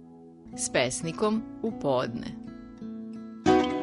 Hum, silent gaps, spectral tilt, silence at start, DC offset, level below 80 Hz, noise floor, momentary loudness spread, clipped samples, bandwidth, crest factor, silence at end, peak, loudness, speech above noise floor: none; none; -4.5 dB/octave; 0 s; under 0.1%; -54 dBFS; -49 dBFS; 18 LU; under 0.1%; 11 kHz; 20 dB; 0 s; -8 dBFS; -28 LUFS; 20 dB